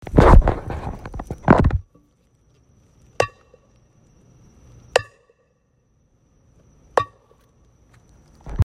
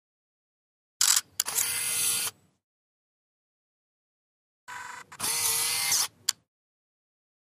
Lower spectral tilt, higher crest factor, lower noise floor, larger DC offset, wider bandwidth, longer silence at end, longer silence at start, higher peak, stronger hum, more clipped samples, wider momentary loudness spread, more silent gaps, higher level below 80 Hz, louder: first, -7 dB/octave vs 2 dB/octave; second, 22 dB vs 28 dB; second, -64 dBFS vs under -90 dBFS; neither; second, 10.5 kHz vs 15.5 kHz; second, 0 s vs 1.15 s; second, 0.1 s vs 1 s; first, 0 dBFS vs -4 dBFS; neither; neither; about the same, 20 LU vs 18 LU; second, none vs 2.64-4.67 s; first, -26 dBFS vs -76 dBFS; first, -20 LUFS vs -25 LUFS